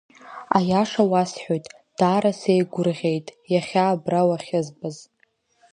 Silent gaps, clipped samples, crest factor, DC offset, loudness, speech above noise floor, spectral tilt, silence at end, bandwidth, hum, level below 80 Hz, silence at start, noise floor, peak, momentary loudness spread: none; under 0.1%; 20 dB; under 0.1%; -22 LUFS; 43 dB; -6.5 dB/octave; 0.7 s; 10 kHz; none; -64 dBFS; 0.25 s; -65 dBFS; -2 dBFS; 15 LU